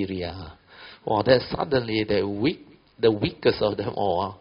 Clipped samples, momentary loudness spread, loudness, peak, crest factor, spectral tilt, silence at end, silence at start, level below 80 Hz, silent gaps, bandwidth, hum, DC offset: under 0.1%; 17 LU; -24 LUFS; -6 dBFS; 20 dB; -4.5 dB/octave; 0.05 s; 0 s; -50 dBFS; none; 5.6 kHz; none; under 0.1%